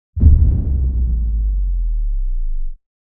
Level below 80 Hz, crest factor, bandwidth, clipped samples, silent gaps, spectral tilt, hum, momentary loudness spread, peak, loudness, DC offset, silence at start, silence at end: -16 dBFS; 14 dB; 1 kHz; under 0.1%; none; -15.5 dB/octave; none; 15 LU; 0 dBFS; -19 LUFS; under 0.1%; 0.15 s; 0.4 s